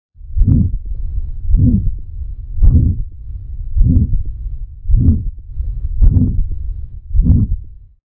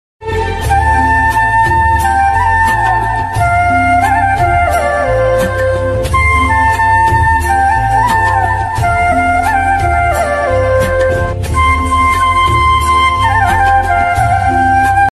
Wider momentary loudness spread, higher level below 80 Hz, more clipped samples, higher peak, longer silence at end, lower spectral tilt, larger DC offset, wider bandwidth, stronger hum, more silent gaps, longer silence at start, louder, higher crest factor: first, 16 LU vs 4 LU; first, -16 dBFS vs -22 dBFS; neither; about the same, 0 dBFS vs 0 dBFS; first, 0.35 s vs 0.05 s; first, -16.5 dB/octave vs -5.5 dB/octave; neither; second, 1.2 kHz vs 14 kHz; neither; neither; about the same, 0.2 s vs 0.2 s; second, -17 LUFS vs -11 LUFS; about the same, 14 dB vs 10 dB